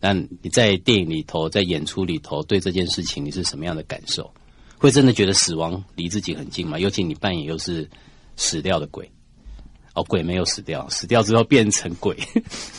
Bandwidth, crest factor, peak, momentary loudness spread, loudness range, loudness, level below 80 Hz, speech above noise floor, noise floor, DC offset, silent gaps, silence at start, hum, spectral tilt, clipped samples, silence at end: 11.5 kHz; 20 dB; -2 dBFS; 12 LU; 5 LU; -21 LUFS; -46 dBFS; 20 dB; -41 dBFS; under 0.1%; none; 0 s; none; -4 dB/octave; under 0.1%; 0 s